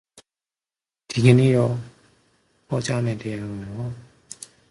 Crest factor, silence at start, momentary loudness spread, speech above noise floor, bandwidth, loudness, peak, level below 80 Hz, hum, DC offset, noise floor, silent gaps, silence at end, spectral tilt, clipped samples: 22 dB; 0.15 s; 23 LU; over 70 dB; 11.5 kHz; -22 LUFS; -2 dBFS; -56 dBFS; none; under 0.1%; under -90 dBFS; none; 0.7 s; -7 dB/octave; under 0.1%